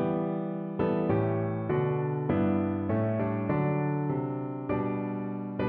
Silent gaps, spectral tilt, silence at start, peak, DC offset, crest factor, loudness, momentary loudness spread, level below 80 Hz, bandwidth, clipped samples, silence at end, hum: none; -9 dB/octave; 0 s; -14 dBFS; under 0.1%; 14 dB; -30 LUFS; 6 LU; -58 dBFS; 4.3 kHz; under 0.1%; 0 s; none